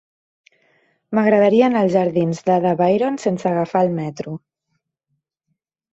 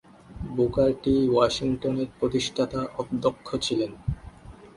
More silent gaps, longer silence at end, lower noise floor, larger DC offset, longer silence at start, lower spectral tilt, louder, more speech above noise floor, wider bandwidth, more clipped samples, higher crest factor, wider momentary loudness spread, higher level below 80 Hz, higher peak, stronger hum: neither; first, 1.55 s vs 0.05 s; first, -74 dBFS vs -45 dBFS; neither; first, 1.1 s vs 0.3 s; first, -7.5 dB/octave vs -6 dB/octave; first, -18 LUFS vs -26 LUFS; first, 57 dB vs 21 dB; second, 8 kHz vs 11.5 kHz; neither; about the same, 16 dB vs 20 dB; about the same, 13 LU vs 12 LU; second, -62 dBFS vs -46 dBFS; first, -2 dBFS vs -6 dBFS; neither